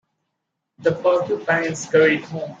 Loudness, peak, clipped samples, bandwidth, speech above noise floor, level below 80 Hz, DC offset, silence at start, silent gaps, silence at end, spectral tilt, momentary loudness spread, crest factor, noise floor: -20 LUFS; -4 dBFS; under 0.1%; 8 kHz; 59 dB; -66 dBFS; under 0.1%; 0.8 s; none; 0.05 s; -5 dB/octave; 8 LU; 18 dB; -78 dBFS